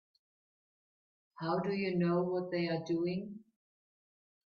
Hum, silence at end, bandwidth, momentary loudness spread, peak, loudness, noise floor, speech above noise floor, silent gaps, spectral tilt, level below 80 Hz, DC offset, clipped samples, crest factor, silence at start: none; 1.1 s; 6.6 kHz; 10 LU; -22 dBFS; -35 LUFS; under -90 dBFS; over 56 dB; none; -8 dB/octave; -76 dBFS; under 0.1%; under 0.1%; 16 dB; 1.4 s